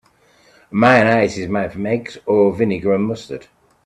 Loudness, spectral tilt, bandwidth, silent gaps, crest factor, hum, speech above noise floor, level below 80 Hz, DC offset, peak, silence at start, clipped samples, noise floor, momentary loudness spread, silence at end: -17 LUFS; -6.5 dB/octave; 10.5 kHz; none; 18 dB; none; 37 dB; -54 dBFS; under 0.1%; 0 dBFS; 0.7 s; under 0.1%; -54 dBFS; 13 LU; 0.45 s